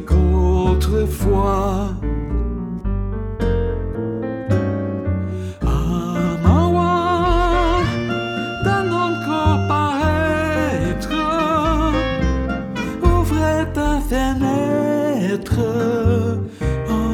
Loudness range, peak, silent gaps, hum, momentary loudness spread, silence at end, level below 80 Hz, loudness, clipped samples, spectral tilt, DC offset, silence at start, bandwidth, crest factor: 4 LU; 0 dBFS; none; none; 7 LU; 0 s; -24 dBFS; -19 LUFS; under 0.1%; -7 dB/octave; under 0.1%; 0 s; 16.5 kHz; 18 dB